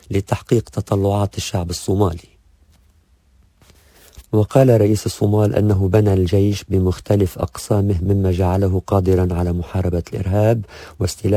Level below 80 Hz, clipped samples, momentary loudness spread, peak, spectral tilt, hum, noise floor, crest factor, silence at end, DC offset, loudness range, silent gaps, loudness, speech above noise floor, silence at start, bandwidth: -32 dBFS; under 0.1%; 7 LU; 0 dBFS; -7.5 dB/octave; none; -55 dBFS; 16 dB; 0 s; under 0.1%; 7 LU; none; -18 LUFS; 38 dB; 0.1 s; 16 kHz